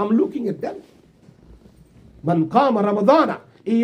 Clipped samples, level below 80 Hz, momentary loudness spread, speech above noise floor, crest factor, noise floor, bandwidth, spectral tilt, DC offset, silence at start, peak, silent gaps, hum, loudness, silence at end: under 0.1%; -58 dBFS; 14 LU; 32 dB; 18 dB; -50 dBFS; 9.6 kHz; -8 dB/octave; under 0.1%; 0 s; -2 dBFS; none; none; -19 LUFS; 0 s